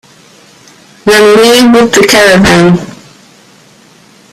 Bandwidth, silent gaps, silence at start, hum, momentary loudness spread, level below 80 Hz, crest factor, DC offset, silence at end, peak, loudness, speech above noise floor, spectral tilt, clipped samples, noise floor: 16.5 kHz; none; 1.05 s; none; 9 LU; -36 dBFS; 8 dB; under 0.1%; 1.45 s; 0 dBFS; -5 LUFS; 36 dB; -4 dB/octave; 0.6%; -40 dBFS